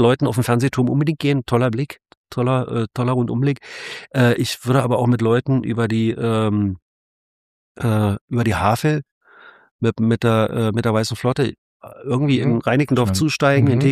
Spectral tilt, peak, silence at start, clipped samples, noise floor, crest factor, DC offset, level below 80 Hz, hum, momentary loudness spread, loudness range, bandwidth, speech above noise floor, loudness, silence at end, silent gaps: -6.5 dB/octave; -2 dBFS; 0 s; under 0.1%; -47 dBFS; 18 dB; under 0.1%; -50 dBFS; none; 8 LU; 3 LU; 15 kHz; 29 dB; -19 LUFS; 0 s; 2.17-2.24 s, 6.82-7.75 s, 8.21-8.28 s, 9.11-9.21 s, 9.71-9.79 s, 11.58-11.80 s